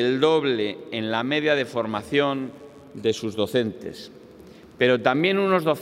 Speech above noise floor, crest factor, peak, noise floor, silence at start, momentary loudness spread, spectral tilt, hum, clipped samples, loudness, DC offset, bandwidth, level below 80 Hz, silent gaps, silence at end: 23 dB; 20 dB; -4 dBFS; -46 dBFS; 0 s; 16 LU; -5.5 dB/octave; none; under 0.1%; -23 LUFS; under 0.1%; 15.5 kHz; -66 dBFS; none; 0 s